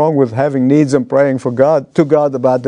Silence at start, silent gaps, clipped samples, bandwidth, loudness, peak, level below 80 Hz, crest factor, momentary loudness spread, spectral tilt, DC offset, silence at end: 0 s; none; under 0.1%; 10.5 kHz; -13 LUFS; 0 dBFS; -58 dBFS; 12 dB; 2 LU; -8 dB/octave; under 0.1%; 0 s